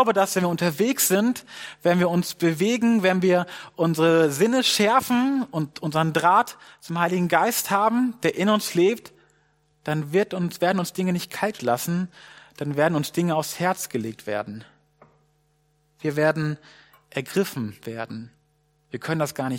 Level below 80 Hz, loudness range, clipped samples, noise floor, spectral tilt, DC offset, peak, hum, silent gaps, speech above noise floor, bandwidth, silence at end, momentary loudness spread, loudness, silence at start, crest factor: -68 dBFS; 8 LU; under 0.1%; -66 dBFS; -5 dB/octave; under 0.1%; -4 dBFS; none; none; 43 dB; 17 kHz; 0 s; 14 LU; -23 LUFS; 0 s; 20 dB